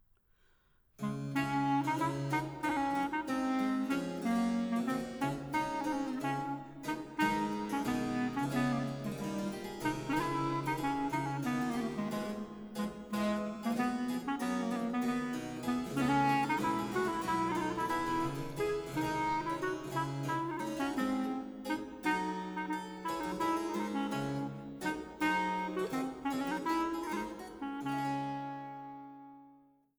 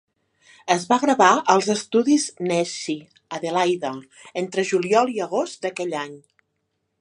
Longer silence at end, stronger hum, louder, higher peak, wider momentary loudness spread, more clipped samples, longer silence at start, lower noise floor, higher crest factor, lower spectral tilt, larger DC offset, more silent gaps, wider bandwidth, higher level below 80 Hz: second, 0.45 s vs 0.8 s; neither; second, -35 LUFS vs -21 LUFS; second, -18 dBFS vs 0 dBFS; second, 7 LU vs 15 LU; neither; first, 1 s vs 0.65 s; second, -69 dBFS vs -75 dBFS; second, 16 dB vs 22 dB; first, -5.5 dB/octave vs -4 dB/octave; neither; neither; first, over 20 kHz vs 11.5 kHz; first, -62 dBFS vs -74 dBFS